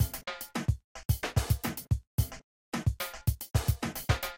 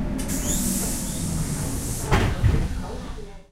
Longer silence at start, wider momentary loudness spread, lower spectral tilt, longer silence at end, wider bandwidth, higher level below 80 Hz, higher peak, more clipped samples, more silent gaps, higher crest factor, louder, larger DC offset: about the same, 0 s vs 0 s; second, 7 LU vs 12 LU; about the same, -5 dB/octave vs -4.5 dB/octave; about the same, 0 s vs 0.1 s; about the same, 17 kHz vs 16 kHz; second, -38 dBFS vs -30 dBFS; second, -12 dBFS vs -6 dBFS; neither; first, 0.84-0.95 s, 1.05-1.09 s, 2.07-2.18 s, 2.44-2.72 s vs none; about the same, 20 dB vs 18 dB; second, -33 LUFS vs -25 LUFS; neither